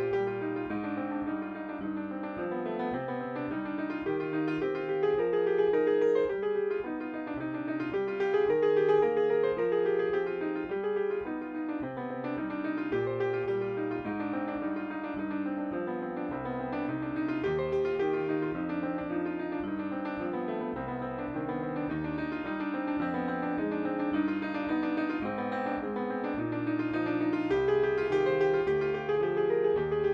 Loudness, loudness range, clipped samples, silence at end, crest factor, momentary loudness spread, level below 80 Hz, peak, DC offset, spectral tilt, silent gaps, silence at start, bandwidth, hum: -31 LUFS; 6 LU; under 0.1%; 0 s; 16 dB; 8 LU; -60 dBFS; -14 dBFS; under 0.1%; -8.5 dB/octave; none; 0 s; 6.2 kHz; none